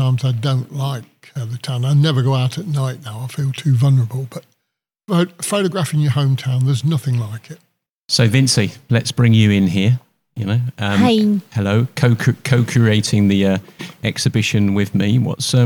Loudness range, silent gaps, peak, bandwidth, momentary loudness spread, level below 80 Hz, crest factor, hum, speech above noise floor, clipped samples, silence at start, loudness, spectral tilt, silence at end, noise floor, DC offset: 4 LU; 7.89-8.09 s; 0 dBFS; 18 kHz; 11 LU; -54 dBFS; 16 dB; none; 61 dB; under 0.1%; 0 s; -17 LUFS; -6 dB/octave; 0 s; -77 dBFS; under 0.1%